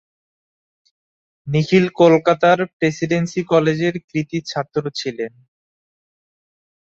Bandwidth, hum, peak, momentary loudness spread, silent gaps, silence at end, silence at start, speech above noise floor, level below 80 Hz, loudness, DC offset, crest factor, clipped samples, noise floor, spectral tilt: 7.8 kHz; none; -2 dBFS; 12 LU; 2.73-2.80 s, 4.04-4.08 s; 1.65 s; 1.45 s; over 73 dB; -60 dBFS; -18 LUFS; under 0.1%; 18 dB; under 0.1%; under -90 dBFS; -6.5 dB/octave